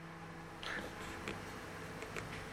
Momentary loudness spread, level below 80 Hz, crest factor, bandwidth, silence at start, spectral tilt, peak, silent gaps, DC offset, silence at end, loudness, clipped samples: 7 LU; -60 dBFS; 22 dB; 17 kHz; 0 s; -4 dB/octave; -24 dBFS; none; under 0.1%; 0 s; -46 LUFS; under 0.1%